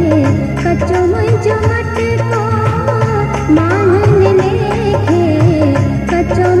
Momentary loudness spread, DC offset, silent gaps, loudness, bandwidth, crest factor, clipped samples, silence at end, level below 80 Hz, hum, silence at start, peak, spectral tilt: 5 LU; under 0.1%; none; -12 LUFS; 11 kHz; 12 dB; under 0.1%; 0 s; -28 dBFS; none; 0 s; 0 dBFS; -8 dB/octave